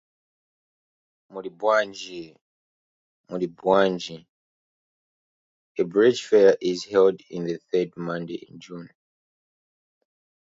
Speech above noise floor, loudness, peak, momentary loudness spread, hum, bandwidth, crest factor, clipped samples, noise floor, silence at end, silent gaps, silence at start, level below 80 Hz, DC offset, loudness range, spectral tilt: over 67 dB; -23 LUFS; -4 dBFS; 21 LU; none; 7.8 kHz; 22 dB; under 0.1%; under -90 dBFS; 1.6 s; 2.41-3.24 s, 4.29-5.75 s; 1.35 s; -70 dBFS; under 0.1%; 8 LU; -5.5 dB/octave